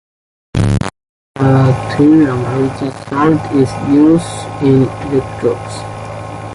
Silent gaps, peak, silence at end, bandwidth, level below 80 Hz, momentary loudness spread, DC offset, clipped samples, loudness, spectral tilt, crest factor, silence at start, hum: 1.09-1.34 s; 0 dBFS; 0 s; 11.5 kHz; -36 dBFS; 15 LU; under 0.1%; under 0.1%; -13 LUFS; -7.5 dB/octave; 14 dB; 0.55 s; none